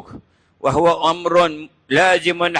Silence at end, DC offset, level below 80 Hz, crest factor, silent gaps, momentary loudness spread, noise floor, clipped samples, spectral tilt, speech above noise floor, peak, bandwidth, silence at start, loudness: 0 s; under 0.1%; -50 dBFS; 14 dB; none; 7 LU; -42 dBFS; under 0.1%; -4.5 dB/octave; 26 dB; -4 dBFS; 10.5 kHz; 0.1 s; -16 LUFS